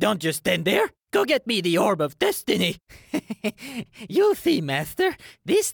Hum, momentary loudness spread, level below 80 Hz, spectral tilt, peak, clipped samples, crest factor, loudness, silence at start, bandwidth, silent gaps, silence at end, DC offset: none; 11 LU; -60 dBFS; -4 dB/octave; -6 dBFS; under 0.1%; 18 dB; -23 LUFS; 0 s; over 20 kHz; none; 0 s; under 0.1%